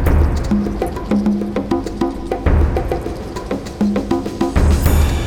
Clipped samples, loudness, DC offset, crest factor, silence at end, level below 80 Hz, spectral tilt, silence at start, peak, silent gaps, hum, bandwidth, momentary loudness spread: under 0.1%; -18 LUFS; under 0.1%; 16 dB; 0 s; -20 dBFS; -7 dB/octave; 0 s; 0 dBFS; none; none; over 20 kHz; 8 LU